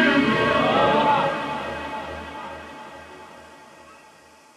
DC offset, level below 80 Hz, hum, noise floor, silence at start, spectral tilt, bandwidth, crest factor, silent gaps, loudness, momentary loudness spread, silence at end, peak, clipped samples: under 0.1%; -50 dBFS; none; -51 dBFS; 0 s; -5.5 dB/octave; 13.5 kHz; 18 dB; none; -21 LUFS; 23 LU; 0.65 s; -6 dBFS; under 0.1%